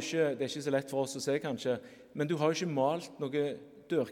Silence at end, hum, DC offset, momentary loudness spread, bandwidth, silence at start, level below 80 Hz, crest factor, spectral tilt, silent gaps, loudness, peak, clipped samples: 0 s; none; under 0.1%; 7 LU; 16.5 kHz; 0 s; -78 dBFS; 18 dB; -5 dB/octave; none; -33 LUFS; -14 dBFS; under 0.1%